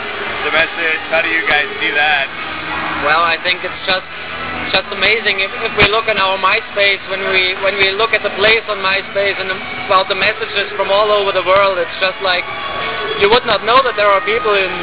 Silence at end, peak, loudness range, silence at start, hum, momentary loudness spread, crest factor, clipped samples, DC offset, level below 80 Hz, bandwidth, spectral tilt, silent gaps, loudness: 0 s; 0 dBFS; 2 LU; 0 s; none; 8 LU; 14 dB; under 0.1%; 1%; -42 dBFS; 4 kHz; -6.5 dB/octave; none; -13 LUFS